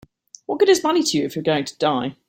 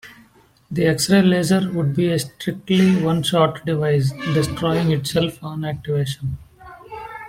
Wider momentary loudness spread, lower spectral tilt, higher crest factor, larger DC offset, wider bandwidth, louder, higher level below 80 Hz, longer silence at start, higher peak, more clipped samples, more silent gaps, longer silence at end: second, 8 LU vs 12 LU; second, -4 dB/octave vs -6 dB/octave; about the same, 16 dB vs 16 dB; neither; about the same, 16.5 kHz vs 16 kHz; about the same, -20 LUFS vs -19 LUFS; second, -62 dBFS vs -50 dBFS; first, 0.5 s vs 0.05 s; about the same, -4 dBFS vs -4 dBFS; neither; neither; first, 0.15 s vs 0 s